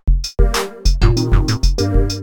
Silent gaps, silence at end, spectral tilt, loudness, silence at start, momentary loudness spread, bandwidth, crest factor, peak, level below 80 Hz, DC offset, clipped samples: none; 0 s; -5.5 dB/octave; -17 LUFS; 0.05 s; 4 LU; 16 kHz; 14 dB; 0 dBFS; -16 dBFS; under 0.1%; under 0.1%